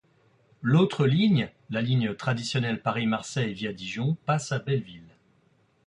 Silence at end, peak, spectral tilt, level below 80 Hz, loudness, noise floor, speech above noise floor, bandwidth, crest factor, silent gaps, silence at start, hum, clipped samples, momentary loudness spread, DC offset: 0.8 s; -10 dBFS; -6.5 dB/octave; -62 dBFS; -27 LUFS; -65 dBFS; 39 dB; 10.5 kHz; 16 dB; none; 0.6 s; none; under 0.1%; 9 LU; under 0.1%